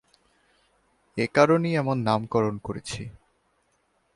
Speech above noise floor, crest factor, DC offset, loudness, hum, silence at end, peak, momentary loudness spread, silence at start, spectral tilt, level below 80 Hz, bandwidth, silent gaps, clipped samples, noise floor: 45 dB; 22 dB; under 0.1%; -25 LUFS; none; 1.05 s; -4 dBFS; 17 LU; 1.15 s; -6.5 dB/octave; -58 dBFS; 11.5 kHz; none; under 0.1%; -69 dBFS